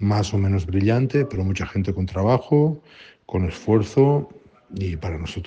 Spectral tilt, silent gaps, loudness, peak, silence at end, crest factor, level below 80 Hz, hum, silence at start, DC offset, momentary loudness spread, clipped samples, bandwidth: -8 dB/octave; none; -22 LUFS; -4 dBFS; 0 s; 16 dB; -46 dBFS; none; 0 s; under 0.1%; 11 LU; under 0.1%; 8.2 kHz